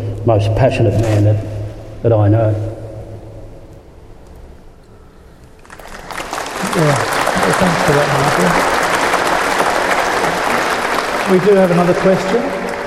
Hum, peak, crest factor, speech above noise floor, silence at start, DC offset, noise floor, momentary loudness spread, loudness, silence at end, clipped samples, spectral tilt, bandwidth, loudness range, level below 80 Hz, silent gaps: none; 0 dBFS; 16 dB; 28 dB; 0 s; under 0.1%; -40 dBFS; 14 LU; -14 LUFS; 0 s; under 0.1%; -5.5 dB/octave; 15.5 kHz; 12 LU; -36 dBFS; none